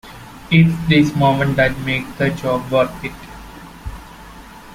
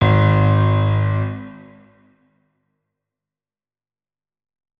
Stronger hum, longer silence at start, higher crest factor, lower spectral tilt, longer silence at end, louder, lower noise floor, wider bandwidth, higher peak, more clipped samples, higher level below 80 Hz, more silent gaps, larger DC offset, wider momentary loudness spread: neither; about the same, 0.05 s vs 0 s; about the same, 16 dB vs 16 dB; second, -7 dB/octave vs -10 dB/octave; second, 0 s vs 3.2 s; about the same, -16 LUFS vs -17 LUFS; second, -38 dBFS vs under -90 dBFS; first, 15.5 kHz vs 4.3 kHz; about the same, -2 dBFS vs -4 dBFS; neither; about the same, -40 dBFS vs -44 dBFS; neither; neither; first, 23 LU vs 16 LU